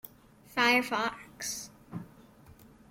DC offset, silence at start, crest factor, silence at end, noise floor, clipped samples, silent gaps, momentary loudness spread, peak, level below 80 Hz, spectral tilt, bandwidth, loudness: under 0.1%; 0.05 s; 22 dB; 0.25 s; -57 dBFS; under 0.1%; none; 20 LU; -12 dBFS; -66 dBFS; -2.5 dB/octave; 16.5 kHz; -30 LUFS